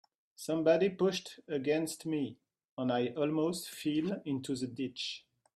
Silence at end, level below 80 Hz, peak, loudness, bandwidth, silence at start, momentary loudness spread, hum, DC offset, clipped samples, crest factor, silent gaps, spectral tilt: 0.35 s; -76 dBFS; -14 dBFS; -34 LUFS; 15.5 kHz; 0.4 s; 11 LU; none; under 0.1%; under 0.1%; 20 dB; 2.69-2.77 s; -5 dB/octave